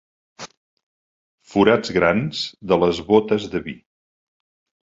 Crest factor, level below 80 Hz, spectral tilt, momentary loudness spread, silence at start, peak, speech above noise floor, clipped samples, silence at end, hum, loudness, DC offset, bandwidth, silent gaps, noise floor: 22 dB; -50 dBFS; -6 dB/octave; 22 LU; 0.4 s; 0 dBFS; over 71 dB; under 0.1%; 1.1 s; none; -19 LUFS; under 0.1%; 7.8 kHz; 0.57-0.77 s, 0.83-1.38 s; under -90 dBFS